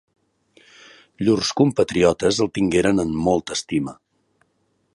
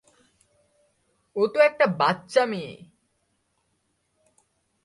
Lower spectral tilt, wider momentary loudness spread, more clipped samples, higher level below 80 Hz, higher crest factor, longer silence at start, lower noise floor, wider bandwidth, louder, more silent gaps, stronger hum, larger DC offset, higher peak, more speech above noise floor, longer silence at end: about the same, -5 dB/octave vs -5.5 dB/octave; second, 7 LU vs 15 LU; neither; first, -48 dBFS vs -72 dBFS; about the same, 18 dB vs 22 dB; second, 1.2 s vs 1.35 s; second, -68 dBFS vs -73 dBFS; about the same, 11.5 kHz vs 11.5 kHz; first, -20 LUFS vs -23 LUFS; neither; neither; neither; about the same, -4 dBFS vs -6 dBFS; about the same, 48 dB vs 50 dB; second, 1 s vs 2.1 s